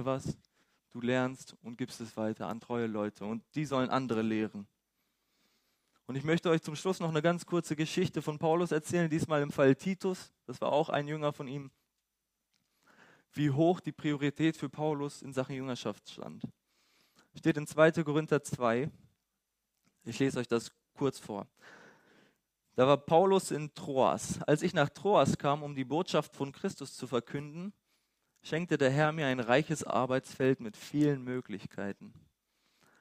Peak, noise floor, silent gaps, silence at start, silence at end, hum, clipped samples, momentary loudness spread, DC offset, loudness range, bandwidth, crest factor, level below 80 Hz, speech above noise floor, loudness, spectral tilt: -10 dBFS; -85 dBFS; none; 0 s; 0.9 s; none; under 0.1%; 15 LU; under 0.1%; 6 LU; 15.5 kHz; 22 dB; -70 dBFS; 53 dB; -32 LUFS; -6 dB/octave